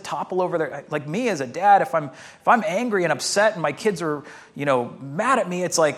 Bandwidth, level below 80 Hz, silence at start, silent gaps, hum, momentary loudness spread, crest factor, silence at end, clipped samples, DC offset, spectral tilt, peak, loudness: 15.5 kHz; -72 dBFS; 0 s; none; none; 10 LU; 18 dB; 0 s; under 0.1%; under 0.1%; -4 dB/octave; -4 dBFS; -22 LUFS